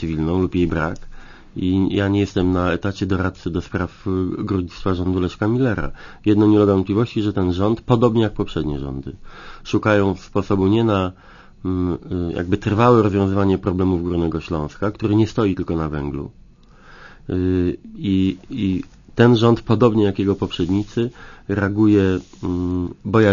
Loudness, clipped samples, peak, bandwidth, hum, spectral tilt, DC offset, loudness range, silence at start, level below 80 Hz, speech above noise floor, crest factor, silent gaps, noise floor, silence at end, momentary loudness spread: -20 LUFS; under 0.1%; 0 dBFS; 7.4 kHz; none; -8 dB/octave; under 0.1%; 4 LU; 0 s; -40 dBFS; 27 dB; 18 dB; none; -46 dBFS; 0 s; 11 LU